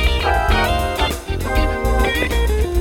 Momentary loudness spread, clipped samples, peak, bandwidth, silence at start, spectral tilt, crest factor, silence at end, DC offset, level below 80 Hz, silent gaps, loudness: 4 LU; under 0.1%; -2 dBFS; 17 kHz; 0 s; -5 dB/octave; 14 dB; 0 s; under 0.1%; -20 dBFS; none; -18 LUFS